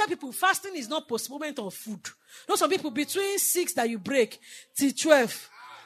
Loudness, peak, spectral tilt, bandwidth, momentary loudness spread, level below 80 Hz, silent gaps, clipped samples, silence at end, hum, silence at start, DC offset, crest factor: -27 LUFS; -4 dBFS; -2 dB/octave; 13.5 kHz; 17 LU; -84 dBFS; none; under 0.1%; 0 s; none; 0 s; under 0.1%; 24 dB